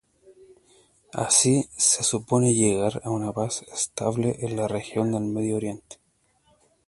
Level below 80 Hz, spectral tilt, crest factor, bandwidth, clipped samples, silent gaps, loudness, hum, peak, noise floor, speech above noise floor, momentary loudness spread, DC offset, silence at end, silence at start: -58 dBFS; -4 dB/octave; 20 dB; 11.5 kHz; under 0.1%; none; -23 LUFS; none; -6 dBFS; -67 dBFS; 42 dB; 10 LU; under 0.1%; 0.95 s; 0.3 s